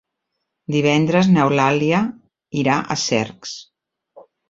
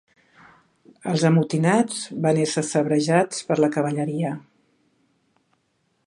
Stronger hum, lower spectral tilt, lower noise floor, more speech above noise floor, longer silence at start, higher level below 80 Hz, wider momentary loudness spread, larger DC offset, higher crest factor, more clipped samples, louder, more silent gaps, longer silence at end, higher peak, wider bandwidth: neither; about the same, -5.5 dB/octave vs -5.5 dB/octave; first, -77 dBFS vs -70 dBFS; first, 60 dB vs 49 dB; second, 0.7 s vs 1.05 s; first, -56 dBFS vs -68 dBFS; first, 17 LU vs 8 LU; neither; about the same, 18 dB vs 20 dB; neither; first, -18 LUFS vs -22 LUFS; neither; second, 0.3 s vs 1.7 s; about the same, -2 dBFS vs -4 dBFS; second, 7.8 kHz vs 11 kHz